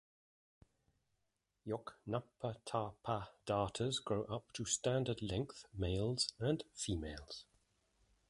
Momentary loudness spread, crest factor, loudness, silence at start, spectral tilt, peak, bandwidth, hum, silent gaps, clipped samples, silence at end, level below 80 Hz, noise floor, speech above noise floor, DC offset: 9 LU; 20 dB; -41 LUFS; 1.65 s; -4.5 dB/octave; -22 dBFS; 11.5 kHz; none; none; under 0.1%; 0.85 s; -58 dBFS; -86 dBFS; 45 dB; under 0.1%